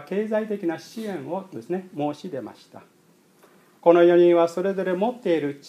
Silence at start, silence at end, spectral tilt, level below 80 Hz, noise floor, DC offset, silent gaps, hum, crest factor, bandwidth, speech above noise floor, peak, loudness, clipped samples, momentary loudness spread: 0 s; 0 s; -7 dB/octave; -82 dBFS; -57 dBFS; under 0.1%; none; none; 20 dB; 10.5 kHz; 35 dB; -2 dBFS; -22 LUFS; under 0.1%; 17 LU